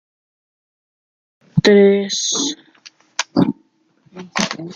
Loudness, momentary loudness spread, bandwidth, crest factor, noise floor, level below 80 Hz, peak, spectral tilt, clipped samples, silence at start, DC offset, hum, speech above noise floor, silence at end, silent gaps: -17 LUFS; 16 LU; 9.2 kHz; 18 dB; -58 dBFS; -56 dBFS; 0 dBFS; -4 dB/octave; under 0.1%; 1.55 s; under 0.1%; none; 42 dB; 0 s; none